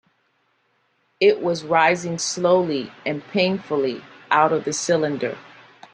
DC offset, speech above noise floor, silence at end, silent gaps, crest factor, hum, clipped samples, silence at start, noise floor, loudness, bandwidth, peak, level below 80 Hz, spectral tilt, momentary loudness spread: under 0.1%; 46 dB; 0.5 s; none; 18 dB; none; under 0.1%; 1.2 s; -67 dBFS; -21 LUFS; 10.5 kHz; -4 dBFS; -66 dBFS; -4 dB/octave; 10 LU